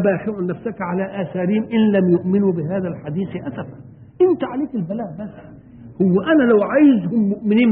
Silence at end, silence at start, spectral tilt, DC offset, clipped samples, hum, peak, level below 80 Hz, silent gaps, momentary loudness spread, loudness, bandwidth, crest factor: 0 s; 0 s; -12.5 dB/octave; under 0.1%; under 0.1%; none; -4 dBFS; -54 dBFS; none; 13 LU; -18 LUFS; 3.8 kHz; 14 dB